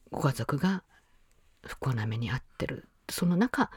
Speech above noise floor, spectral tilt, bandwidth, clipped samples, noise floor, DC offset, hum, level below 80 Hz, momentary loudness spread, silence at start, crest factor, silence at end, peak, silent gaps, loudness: 33 dB; -6 dB/octave; 18.5 kHz; under 0.1%; -63 dBFS; under 0.1%; none; -54 dBFS; 12 LU; 0.1 s; 20 dB; 0 s; -12 dBFS; none; -31 LUFS